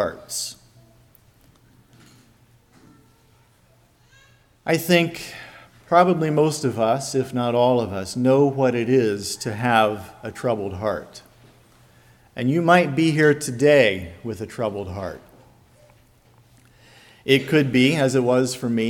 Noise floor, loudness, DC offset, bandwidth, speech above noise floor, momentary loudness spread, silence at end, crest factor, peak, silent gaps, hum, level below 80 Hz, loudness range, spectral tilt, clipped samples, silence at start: -57 dBFS; -20 LUFS; under 0.1%; 18 kHz; 37 dB; 16 LU; 0 s; 20 dB; -2 dBFS; none; none; -58 dBFS; 8 LU; -5.5 dB/octave; under 0.1%; 0 s